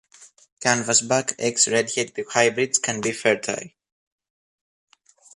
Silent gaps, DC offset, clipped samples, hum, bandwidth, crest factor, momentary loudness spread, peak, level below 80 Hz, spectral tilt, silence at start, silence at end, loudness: 0.52-0.57 s; under 0.1%; under 0.1%; none; 11.5 kHz; 22 dB; 7 LU; -4 dBFS; -68 dBFS; -2 dB/octave; 0.2 s; 1.65 s; -21 LUFS